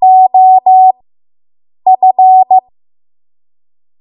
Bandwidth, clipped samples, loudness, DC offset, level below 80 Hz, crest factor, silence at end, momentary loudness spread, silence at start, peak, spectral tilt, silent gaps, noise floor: 1.1 kHz; under 0.1%; -7 LUFS; under 0.1%; -70 dBFS; 8 dB; 1.4 s; 6 LU; 0 s; 0 dBFS; -9 dB/octave; none; under -90 dBFS